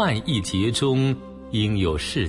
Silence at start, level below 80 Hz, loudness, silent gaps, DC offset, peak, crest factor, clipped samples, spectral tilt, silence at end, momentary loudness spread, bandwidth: 0 s; -42 dBFS; -23 LUFS; none; under 0.1%; -8 dBFS; 14 dB; under 0.1%; -5.5 dB/octave; 0 s; 5 LU; 11.5 kHz